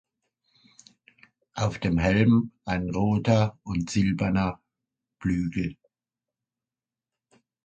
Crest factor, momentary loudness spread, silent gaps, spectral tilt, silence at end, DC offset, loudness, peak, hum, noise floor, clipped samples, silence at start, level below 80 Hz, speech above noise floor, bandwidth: 20 dB; 10 LU; none; -7 dB/octave; 1.9 s; under 0.1%; -26 LUFS; -8 dBFS; none; under -90 dBFS; under 0.1%; 1.55 s; -46 dBFS; over 66 dB; 9 kHz